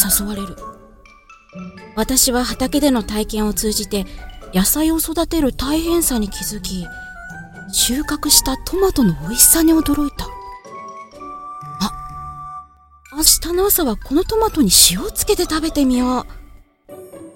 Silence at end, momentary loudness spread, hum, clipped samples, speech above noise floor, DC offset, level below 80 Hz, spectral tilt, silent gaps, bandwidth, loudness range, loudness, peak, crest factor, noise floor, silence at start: 0.05 s; 22 LU; none; under 0.1%; 29 dB; under 0.1%; -32 dBFS; -3 dB/octave; none; 17 kHz; 5 LU; -16 LUFS; 0 dBFS; 18 dB; -46 dBFS; 0 s